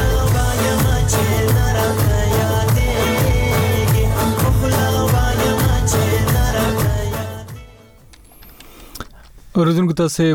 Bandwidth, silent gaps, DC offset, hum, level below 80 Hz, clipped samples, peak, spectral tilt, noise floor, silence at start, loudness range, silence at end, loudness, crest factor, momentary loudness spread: 18 kHz; none; under 0.1%; none; -24 dBFS; under 0.1%; -4 dBFS; -5.5 dB/octave; -44 dBFS; 0 s; 6 LU; 0 s; -17 LUFS; 12 dB; 10 LU